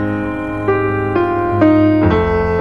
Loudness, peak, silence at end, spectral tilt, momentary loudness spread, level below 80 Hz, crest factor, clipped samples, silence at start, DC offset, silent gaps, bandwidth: -14 LUFS; 0 dBFS; 0 s; -9.5 dB/octave; 8 LU; -32 dBFS; 14 dB; under 0.1%; 0 s; 1%; none; 5.4 kHz